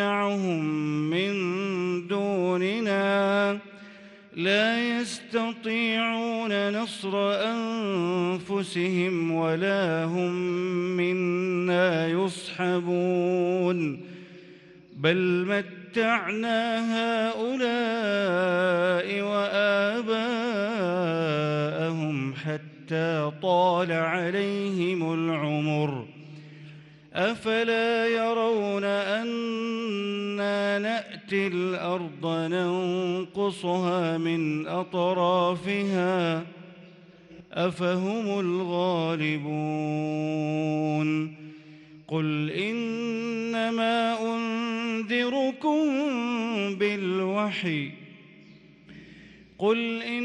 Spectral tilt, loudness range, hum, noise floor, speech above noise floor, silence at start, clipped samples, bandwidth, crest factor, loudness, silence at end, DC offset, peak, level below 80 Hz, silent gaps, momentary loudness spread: -6 dB/octave; 3 LU; none; -52 dBFS; 26 dB; 0 s; under 0.1%; 11 kHz; 16 dB; -27 LUFS; 0 s; under 0.1%; -10 dBFS; -74 dBFS; none; 6 LU